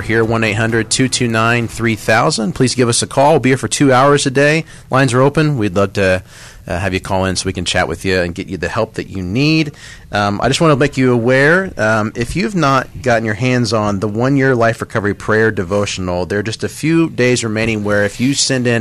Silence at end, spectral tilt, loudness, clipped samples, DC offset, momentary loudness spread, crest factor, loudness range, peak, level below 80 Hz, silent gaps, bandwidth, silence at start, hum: 0 s; -5 dB/octave; -14 LUFS; under 0.1%; 0.2%; 7 LU; 12 dB; 4 LU; -2 dBFS; -40 dBFS; none; 13.5 kHz; 0 s; none